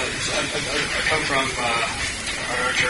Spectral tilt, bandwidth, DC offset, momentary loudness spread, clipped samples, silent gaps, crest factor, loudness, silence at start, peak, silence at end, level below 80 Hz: -2 dB/octave; 11.5 kHz; under 0.1%; 4 LU; under 0.1%; none; 16 dB; -22 LUFS; 0 s; -8 dBFS; 0 s; -42 dBFS